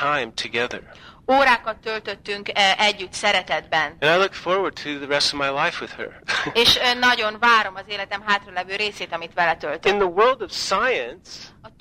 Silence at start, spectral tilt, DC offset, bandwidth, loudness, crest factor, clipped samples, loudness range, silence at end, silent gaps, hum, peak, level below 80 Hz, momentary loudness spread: 0 s; -2.5 dB/octave; under 0.1%; 16 kHz; -20 LUFS; 18 dB; under 0.1%; 3 LU; 0.1 s; none; none; -4 dBFS; -52 dBFS; 13 LU